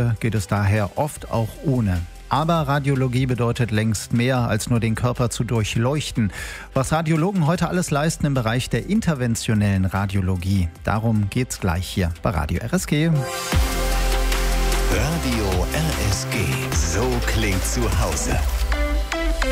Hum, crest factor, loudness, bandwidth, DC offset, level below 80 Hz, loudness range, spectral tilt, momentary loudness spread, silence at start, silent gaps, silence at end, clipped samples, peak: none; 16 dB; -22 LUFS; 16 kHz; under 0.1%; -28 dBFS; 1 LU; -5.5 dB/octave; 4 LU; 0 s; none; 0 s; under 0.1%; -4 dBFS